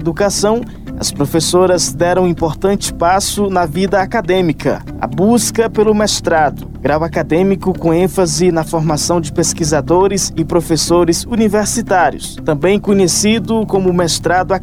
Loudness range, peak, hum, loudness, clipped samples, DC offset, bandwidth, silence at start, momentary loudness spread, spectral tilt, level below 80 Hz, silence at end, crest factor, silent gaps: 1 LU; -2 dBFS; none; -14 LUFS; under 0.1%; under 0.1%; 16.5 kHz; 0 s; 4 LU; -4.5 dB/octave; -32 dBFS; 0 s; 12 dB; none